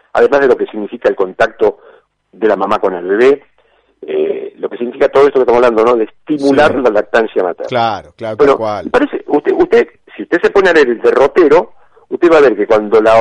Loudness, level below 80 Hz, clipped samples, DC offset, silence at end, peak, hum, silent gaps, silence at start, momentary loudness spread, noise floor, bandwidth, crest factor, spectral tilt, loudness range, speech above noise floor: -12 LUFS; -46 dBFS; under 0.1%; under 0.1%; 0 s; 0 dBFS; none; none; 0.15 s; 10 LU; -54 dBFS; 9.8 kHz; 12 dB; -6 dB/octave; 4 LU; 43 dB